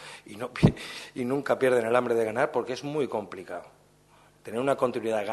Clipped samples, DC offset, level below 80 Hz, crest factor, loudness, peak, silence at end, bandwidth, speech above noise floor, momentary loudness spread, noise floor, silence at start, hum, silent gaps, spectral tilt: under 0.1%; under 0.1%; -50 dBFS; 22 dB; -27 LUFS; -6 dBFS; 0 s; 12.5 kHz; 32 dB; 15 LU; -59 dBFS; 0 s; 50 Hz at -60 dBFS; none; -6.5 dB/octave